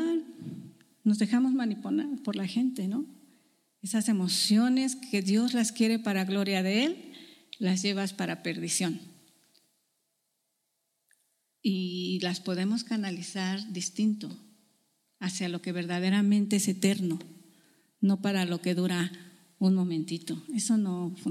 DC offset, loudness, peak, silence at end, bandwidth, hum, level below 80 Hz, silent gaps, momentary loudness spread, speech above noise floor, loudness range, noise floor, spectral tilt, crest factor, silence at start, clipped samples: under 0.1%; -29 LUFS; -12 dBFS; 0 s; 15 kHz; none; -82 dBFS; none; 10 LU; 51 dB; 7 LU; -79 dBFS; -4.5 dB/octave; 18 dB; 0 s; under 0.1%